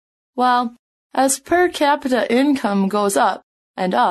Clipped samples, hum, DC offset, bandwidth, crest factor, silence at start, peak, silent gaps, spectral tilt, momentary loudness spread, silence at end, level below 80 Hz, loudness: under 0.1%; none; under 0.1%; 13 kHz; 14 dB; 0.35 s; -4 dBFS; 0.79-1.10 s, 3.43-3.74 s; -4 dB/octave; 11 LU; 0 s; -58 dBFS; -18 LUFS